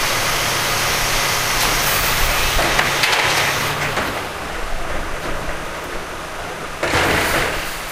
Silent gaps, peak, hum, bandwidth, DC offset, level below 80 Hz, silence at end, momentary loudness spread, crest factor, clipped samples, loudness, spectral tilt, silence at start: none; 0 dBFS; none; 16 kHz; under 0.1%; -30 dBFS; 0 s; 12 LU; 18 dB; under 0.1%; -18 LUFS; -2 dB/octave; 0 s